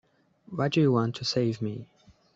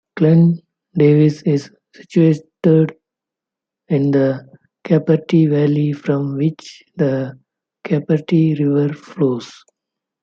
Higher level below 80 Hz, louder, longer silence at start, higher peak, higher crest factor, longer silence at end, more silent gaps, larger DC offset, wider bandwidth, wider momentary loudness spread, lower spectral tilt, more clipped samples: about the same, -66 dBFS vs -62 dBFS; second, -27 LUFS vs -16 LUFS; first, 0.5 s vs 0.15 s; second, -12 dBFS vs -2 dBFS; about the same, 16 dB vs 14 dB; second, 0.5 s vs 0.7 s; neither; neither; first, 8 kHz vs 7.2 kHz; about the same, 14 LU vs 13 LU; second, -6.5 dB/octave vs -9 dB/octave; neither